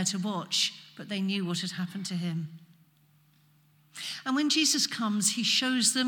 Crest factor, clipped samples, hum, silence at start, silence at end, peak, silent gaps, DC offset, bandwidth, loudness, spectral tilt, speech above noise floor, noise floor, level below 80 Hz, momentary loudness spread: 18 dB; under 0.1%; none; 0 s; 0 s; -12 dBFS; none; under 0.1%; 18 kHz; -28 LUFS; -2.5 dB/octave; 35 dB; -64 dBFS; -88 dBFS; 14 LU